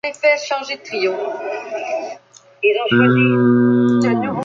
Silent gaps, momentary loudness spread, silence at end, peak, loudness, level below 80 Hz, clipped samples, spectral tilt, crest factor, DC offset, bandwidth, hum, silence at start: none; 12 LU; 0 s; -2 dBFS; -17 LUFS; -60 dBFS; under 0.1%; -6.5 dB/octave; 14 dB; under 0.1%; 7.6 kHz; none; 0.05 s